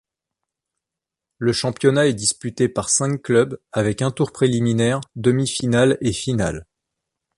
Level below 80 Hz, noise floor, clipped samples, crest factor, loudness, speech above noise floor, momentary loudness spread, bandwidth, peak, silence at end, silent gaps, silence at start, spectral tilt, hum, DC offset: -48 dBFS; -86 dBFS; under 0.1%; 18 dB; -20 LUFS; 67 dB; 6 LU; 11.5 kHz; -2 dBFS; 0.75 s; none; 1.4 s; -5 dB/octave; none; under 0.1%